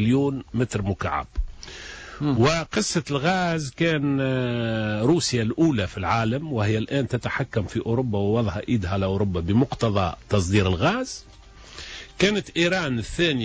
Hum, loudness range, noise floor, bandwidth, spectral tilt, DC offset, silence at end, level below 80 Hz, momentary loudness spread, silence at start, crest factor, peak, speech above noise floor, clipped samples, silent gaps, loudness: none; 2 LU; -44 dBFS; 8 kHz; -5.5 dB/octave; under 0.1%; 0 s; -40 dBFS; 12 LU; 0 s; 14 dB; -8 dBFS; 21 dB; under 0.1%; none; -24 LUFS